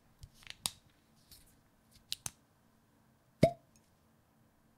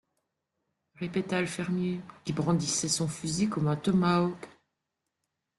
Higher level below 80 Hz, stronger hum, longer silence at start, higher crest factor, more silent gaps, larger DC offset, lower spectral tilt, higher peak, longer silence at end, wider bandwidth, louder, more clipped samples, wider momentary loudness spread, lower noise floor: about the same, -64 dBFS vs -64 dBFS; neither; second, 0.65 s vs 1 s; first, 34 dB vs 18 dB; neither; neither; about the same, -4.5 dB/octave vs -5 dB/octave; first, -8 dBFS vs -12 dBFS; first, 1.25 s vs 1.1 s; first, 16 kHz vs 12 kHz; second, -37 LUFS vs -29 LUFS; neither; first, 28 LU vs 10 LU; second, -70 dBFS vs -84 dBFS